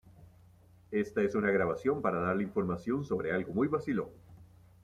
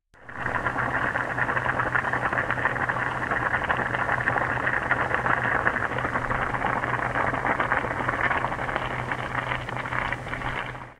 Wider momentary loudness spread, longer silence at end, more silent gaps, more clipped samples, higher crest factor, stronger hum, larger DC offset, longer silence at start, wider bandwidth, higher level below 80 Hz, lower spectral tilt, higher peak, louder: about the same, 6 LU vs 5 LU; first, 0.4 s vs 0.05 s; neither; neither; about the same, 18 dB vs 22 dB; neither; neither; second, 0.05 s vs 0.2 s; second, 11 kHz vs 14 kHz; second, -64 dBFS vs -44 dBFS; first, -8 dB/octave vs -6 dB/octave; second, -16 dBFS vs -4 dBFS; second, -32 LUFS vs -26 LUFS